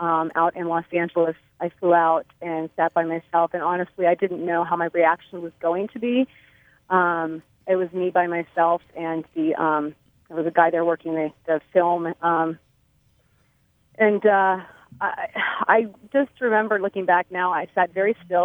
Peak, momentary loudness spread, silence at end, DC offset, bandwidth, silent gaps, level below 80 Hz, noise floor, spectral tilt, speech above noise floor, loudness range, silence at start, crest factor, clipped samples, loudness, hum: -2 dBFS; 9 LU; 0 s; under 0.1%; 3.8 kHz; none; -68 dBFS; -64 dBFS; -8.5 dB/octave; 42 dB; 2 LU; 0 s; 20 dB; under 0.1%; -22 LUFS; none